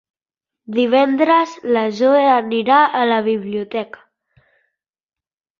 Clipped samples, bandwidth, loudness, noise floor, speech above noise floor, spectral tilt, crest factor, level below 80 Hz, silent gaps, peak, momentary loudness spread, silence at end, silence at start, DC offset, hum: under 0.1%; 7.4 kHz; -16 LUFS; under -90 dBFS; over 75 dB; -5.5 dB/octave; 16 dB; -66 dBFS; none; -2 dBFS; 11 LU; 1.75 s; 0.7 s; under 0.1%; none